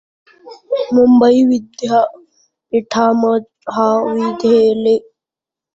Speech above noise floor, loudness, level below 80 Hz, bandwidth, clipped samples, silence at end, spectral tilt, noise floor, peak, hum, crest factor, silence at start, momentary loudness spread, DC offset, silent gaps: 75 dB; -14 LUFS; -56 dBFS; 7.8 kHz; under 0.1%; 0.75 s; -6 dB/octave; -87 dBFS; -2 dBFS; none; 12 dB; 0.45 s; 11 LU; under 0.1%; none